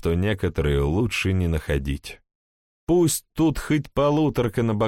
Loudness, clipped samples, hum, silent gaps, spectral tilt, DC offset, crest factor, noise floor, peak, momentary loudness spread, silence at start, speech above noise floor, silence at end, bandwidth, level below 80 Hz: -23 LUFS; under 0.1%; none; 2.35-2.87 s; -6 dB/octave; under 0.1%; 12 dB; under -90 dBFS; -10 dBFS; 6 LU; 0.05 s; over 68 dB; 0 s; 16.5 kHz; -34 dBFS